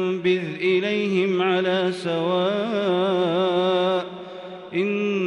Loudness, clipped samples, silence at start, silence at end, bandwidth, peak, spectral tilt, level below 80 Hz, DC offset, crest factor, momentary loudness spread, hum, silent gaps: -22 LUFS; under 0.1%; 0 s; 0 s; 10.5 kHz; -10 dBFS; -6.5 dB/octave; -70 dBFS; under 0.1%; 12 dB; 7 LU; none; none